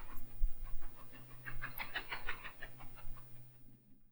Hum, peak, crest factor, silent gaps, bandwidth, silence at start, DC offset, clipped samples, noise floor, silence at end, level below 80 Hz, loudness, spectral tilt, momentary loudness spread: none; -20 dBFS; 18 dB; none; over 20 kHz; 0 s; under 0.1%; under 0.1%; -57 dBFS; 0.1 s; -44 dBFS; -47 LUFS; -4 dB/octave; 14 LU